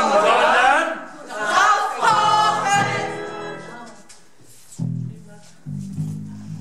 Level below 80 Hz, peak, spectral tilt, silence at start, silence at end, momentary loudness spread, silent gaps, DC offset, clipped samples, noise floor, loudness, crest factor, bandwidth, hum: -60 dBFS; -4 dBFS; -3.5 dB/octave; 0 s; 0 s; 19 LU; none; 0.6%; under 0.1%; -50 dBFS; -18 LUFS; 16 dB; 14.5 kHz; none